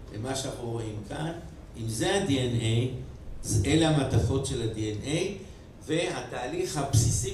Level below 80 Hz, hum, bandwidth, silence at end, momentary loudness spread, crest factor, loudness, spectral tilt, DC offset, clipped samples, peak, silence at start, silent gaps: -44 dBFS; none; 14.5 kHz; 0 s; 15 LU; 20 dB; -29 LUFS; -5 dB/octave; under 0.1%; under 0.1%; -10 dBFS; 0 s; none